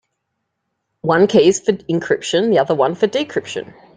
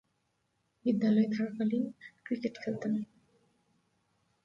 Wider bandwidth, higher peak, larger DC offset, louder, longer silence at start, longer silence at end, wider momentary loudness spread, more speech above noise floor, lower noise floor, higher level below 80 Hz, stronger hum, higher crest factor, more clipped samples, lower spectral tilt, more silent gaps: first, 9.4 kHz vs 7 kHz; first, -2 dBFS vs -18 dBFS; neither; first, -16 LUFS vs -33 LUFS; first, 1.05 s vs 0.85 s; second, 0.35 s vs 1.4 s; about the same, 12 LU vs 11 LU; first, 58 dB vs 47 dB; second, -74 dBFS vs -78 dBFS; first, -60 dBFS vs -78 dBFS; neither; about the same, 16 dB vs 18 dB; neither; second, -5 dB/octave vs -8 dB/octave; neither